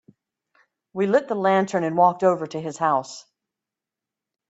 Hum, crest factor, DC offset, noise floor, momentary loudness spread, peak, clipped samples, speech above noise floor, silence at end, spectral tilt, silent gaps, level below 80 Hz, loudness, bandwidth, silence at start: none; 20 dB; under 0.1%; -88 dBFS; 15 LU; -4 dBFS; under 0.1%; 66 dB; 1.3 s; -6 dB/octave; none; -72 dBFS; -22 LUFS; 8.2 kHz; 0.95 s